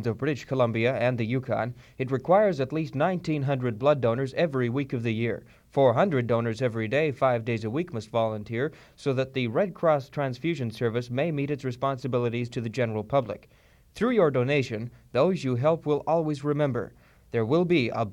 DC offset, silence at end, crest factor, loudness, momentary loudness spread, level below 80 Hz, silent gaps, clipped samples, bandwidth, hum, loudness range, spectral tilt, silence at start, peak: under 0.1%; 0 s; 18 dB; -27 LUFS; 8 LU; -60 dBFS; none; under 0.1%; 11 kHz; none; 3 LU; -7.5 dB/octave; 0 s; -8 dBFS